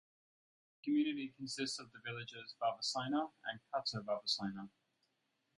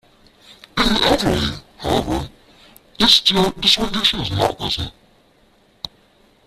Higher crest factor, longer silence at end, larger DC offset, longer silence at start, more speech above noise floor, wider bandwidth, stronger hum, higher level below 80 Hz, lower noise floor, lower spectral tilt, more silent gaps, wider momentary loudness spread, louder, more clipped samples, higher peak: about the same, 18 dB vs 20 dB; first, 0.9 s vs 0.6 s; neither; first, 0.85 s vs 0.5 s; first, 43 dB vs 38 dB; second, 11.5 kHz vs 15.5 kHz; neither; second, -82 dBFS vs -36 dBFS; first, -83 dBFS vs -55 dBFS; about the same, -4 dB/octave vs -4 dB/octave; neither; second, 11 LU vs 20 LU; second, -40 LUFS vs -17 LUFS; neither; second, -24 dBFS vs 0 dBFS